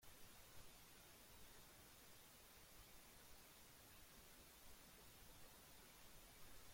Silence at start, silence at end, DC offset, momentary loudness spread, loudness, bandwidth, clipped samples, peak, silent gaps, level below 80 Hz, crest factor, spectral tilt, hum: 0 s; 0 s; under 0.1%; 0 LU; -64 LUFS; 16.5 kHz; under 0.1%; -48 dBFS; none; -74 dBFS; 16 dB; -2 dB/octave; none